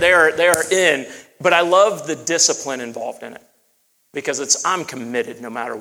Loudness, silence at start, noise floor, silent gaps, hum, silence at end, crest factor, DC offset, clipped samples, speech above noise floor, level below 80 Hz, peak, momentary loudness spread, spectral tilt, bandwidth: -17 LUFS; 0 s; -63 dBFS; none; none; 0 s; 18 dB; under 0.1%; under 0.1%; 45 dB; -58 dBFS; 0 dBFS; 16 LU; -1.5 dB/octave; over 20 kHz